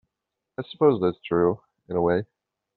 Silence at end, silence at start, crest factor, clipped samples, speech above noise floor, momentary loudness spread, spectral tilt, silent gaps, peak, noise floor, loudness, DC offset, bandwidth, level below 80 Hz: 0.5 s; 0.6 s; 18 dB; under 0.1%; 61 dB; 17 LU; -6.5 dB/octave; none; -6 dBFS; -84 dBFS; -24 LUFS; under 0.1%; 4.4 kHz; -60 dBFS